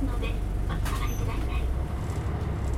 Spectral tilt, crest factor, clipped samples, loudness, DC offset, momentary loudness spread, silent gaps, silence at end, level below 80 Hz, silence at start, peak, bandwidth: -6.5 dB/octave; 12 dB; under 0.1%; -31 LUFS; under 0.1%; 2 LU; none; 0 s; -30 dBFS; 0 s; -16 dBFS; 15.5 kHz